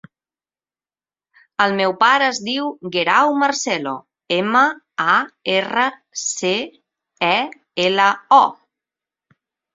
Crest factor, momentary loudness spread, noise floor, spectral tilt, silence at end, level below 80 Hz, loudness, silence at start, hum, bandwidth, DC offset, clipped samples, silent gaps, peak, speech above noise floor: 18 dB; 10 LU; under -90 dBFS; -2.5 dB/octave; 1.2 s; -68 dBFS; -17 LUFS; 1.6 s; none; 7.8 kHz; under 0.1%; under 0.1%; none; -2 dBFS; over 72 dB